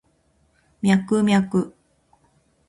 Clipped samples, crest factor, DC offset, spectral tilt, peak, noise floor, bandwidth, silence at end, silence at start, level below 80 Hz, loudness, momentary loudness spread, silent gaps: under 0.1%; 18 dB; under 0.1%; -6.5 dB/octave; -6 dBFS; -63 dBFS; 11.5 kHz; 1 s; 0.85 s; -58 dBFS; -20 LUFS; 7 LU; none